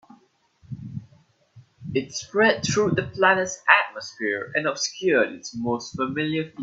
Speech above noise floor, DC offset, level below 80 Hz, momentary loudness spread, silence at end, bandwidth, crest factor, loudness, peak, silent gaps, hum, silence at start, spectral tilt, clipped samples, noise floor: 37 dB; under 0.1%; -60 dBFS; 18 LU; 0 s; 8 kHz; 22 dB; -23 LUFS; -2 dBFS; none; none; 0.7 s; -4 dB/octave; under 0.1%; -60 dBFS